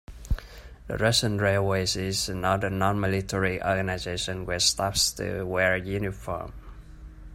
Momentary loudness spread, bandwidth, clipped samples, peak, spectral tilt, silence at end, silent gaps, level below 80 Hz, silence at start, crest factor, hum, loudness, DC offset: 12 LU; 16 kHz; under 0.1%; -8 dBFS; -3.5 dB/octave; 0 s; none; -42 dBFS; 0.1 s; 20 dB; none; -26 LUFS; under 0.1%